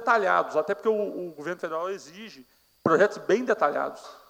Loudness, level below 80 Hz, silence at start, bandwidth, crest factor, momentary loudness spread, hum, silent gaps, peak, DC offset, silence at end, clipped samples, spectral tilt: -26 LUFS; -76 dBFS; 0 s; 16 kHz; 20 dB; 14 LU; none; none; -8 dBFS; under 0.1%; 0.15 s; under 0.1%; -5 dB/octave